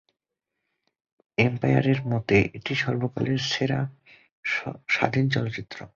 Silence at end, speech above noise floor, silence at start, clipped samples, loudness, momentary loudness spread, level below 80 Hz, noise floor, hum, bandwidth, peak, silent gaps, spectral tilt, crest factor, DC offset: 0.1 s; 59 dB; 1.4 s; under 0.1%; -25 LUFS; 9 LU; -54 dBFS; -84 dBFS; none; 7.2 kHz; -4 dBFS; 4.31-4.43 s; -6 dB/octave; 22 dB; under 0.1%